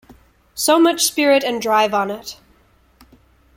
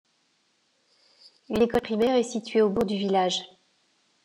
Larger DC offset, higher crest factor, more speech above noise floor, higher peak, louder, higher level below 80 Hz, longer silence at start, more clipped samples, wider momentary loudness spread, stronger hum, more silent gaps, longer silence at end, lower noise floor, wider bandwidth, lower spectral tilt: neither; about the same, 18 dB vs 18 dB; second, 38 dB vs 45 dB; first, -2 dBFS vs -10 dBFS; first, -16 LUFS vs -25 LUFS; about the same, -56 dBFS vs -58 dBFS; second, 0.55 s vs 1.5 s; neither; first, 17 LU vs 7 LU; neither; neither; first, 1.25 s vs 0.8 s; second, -55 dBFS vs -69 dBFS; first, 16.5 kHz vs 14.5 kHz; second, -2 dB/octave vs -5 dB/octave